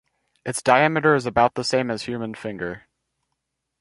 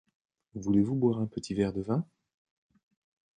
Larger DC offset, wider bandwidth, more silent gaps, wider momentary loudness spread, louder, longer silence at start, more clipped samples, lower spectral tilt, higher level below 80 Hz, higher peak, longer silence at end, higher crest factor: neither; first, 11.5 kHz vs 9.6 kHz; neither; about the same, 15 LU vs 13 LU; first, -21 LUFS vs -30 LUFS; about the same, 0.45 s vs 0.55 s; neither; second, -4.5 dB/octave vs -8 dB/octave; about the same, -54 dBFS vs -58 dBFS; first, -2 dBFS vs -14 dBFS; second, 1 s vs 1.35 s; about the same, 22 dB vs 18 dB